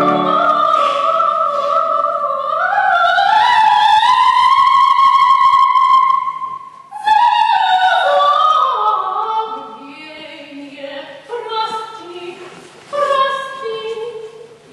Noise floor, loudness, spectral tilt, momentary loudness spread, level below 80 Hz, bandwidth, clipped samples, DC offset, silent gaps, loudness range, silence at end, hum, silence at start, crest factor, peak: -36 dBFS; -13 LUFS; -3 dB/octave; 21 LU; -60 dBFS; 11.5 kHz; under 0.1%; under 0.1%; none; 13 LU; 0.25 s; none; 0 s; 10 dB; -4 dBFS